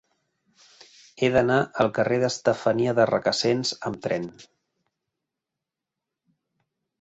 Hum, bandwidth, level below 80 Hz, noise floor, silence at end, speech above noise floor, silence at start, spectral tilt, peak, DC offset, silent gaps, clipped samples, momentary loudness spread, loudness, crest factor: none; 8.2 kHz; -60 dBFS; -87 dBFS; 2.6 s; 63 dB; 1.2 s; -5 dB/octave; -6 dBFS; under 0.1%; none; under 0.1%; 8 LU; -23 LUFS; 20 dB